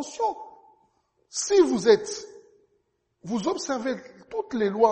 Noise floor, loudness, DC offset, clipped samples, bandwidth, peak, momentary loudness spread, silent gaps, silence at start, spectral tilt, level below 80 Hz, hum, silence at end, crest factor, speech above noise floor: -72 dBFS; -25 LUFS; under 0.1%; under 0.1%; 8.8 kHz; -6 dBFS; 19 LU; none; 0 s; -4 dB/octave; -66 dBFS; none; 0 s; 20 dB; 48 dB